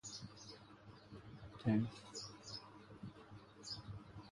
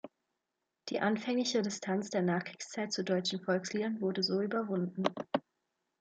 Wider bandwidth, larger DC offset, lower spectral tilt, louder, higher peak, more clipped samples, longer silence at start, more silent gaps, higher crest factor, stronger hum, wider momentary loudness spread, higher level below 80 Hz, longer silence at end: first, 11.5 kHz vs 9 kHz; neither; about the same, -5.5 dB/octave vs -4.5 dB/octave; second, -46 LUFS vs -34 LUFS; second, -24 dBFS vs -12 dBFS; neither; about the same, 0.05 s vs 0.05 s; neither; about the same, 22 dB vs 22 dB; neither; first, 20 LU vs 7 LU; first, -70 dBFS vs -80 dBFS; second, 0.05 s vs 0.6 s